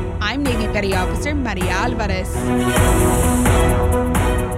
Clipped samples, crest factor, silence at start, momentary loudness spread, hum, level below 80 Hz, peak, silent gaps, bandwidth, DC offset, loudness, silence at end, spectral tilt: under 0.1%; 12 dB; 0 s; 6 LU; none; -24 dBFS; -6 dBFS; none; 16 kHz; under 0.1%; -18 LUFS; 0 s; -5.5 dB/octave